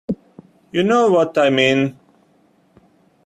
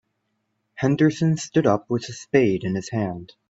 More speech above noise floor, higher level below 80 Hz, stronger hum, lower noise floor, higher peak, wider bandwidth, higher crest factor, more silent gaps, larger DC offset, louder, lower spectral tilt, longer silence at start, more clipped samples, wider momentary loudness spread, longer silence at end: second, 42 dB vs 52 dB; about the same, -60 dBFS vs -58 dBFS; neither; second, -57 dBFS vs -74 dBFS; about the same, -2 dBFS vs -2 dBFS; first, 12 kHz vs 8 kHz; about the same, 18 dB vs 20 dB; neither; neither; first, -16 LUFS vs -22 LUFS; about the same, -5.5 dB/octave vs -6.5 dB/octave; second, 0.1 s vs 0.75 s; neither; first, 12 LU vs 8 LU; first, 1.35 s vs 0.25 s